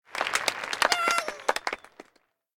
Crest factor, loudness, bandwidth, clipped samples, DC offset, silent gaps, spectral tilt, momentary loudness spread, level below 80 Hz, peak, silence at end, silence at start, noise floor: 24 dB; -27 LUFS; 19 kHz; under 0.1%; under 0.1%; none; 0.5 dB/octave; 9 LU; -66 dBFS; -6 dBFS; 0.55 s; 0.1 s; -67 dBFS